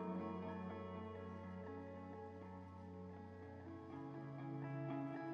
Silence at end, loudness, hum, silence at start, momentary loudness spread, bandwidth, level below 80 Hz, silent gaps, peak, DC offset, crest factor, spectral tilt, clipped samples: 0 s; -51 LUFS; none; 0 s; 9 LU; 7 kHz; -78 dBFS; none; -34 dBFS; under 0.1%; 14 dB; -7.5 dB/octave; under 0.1%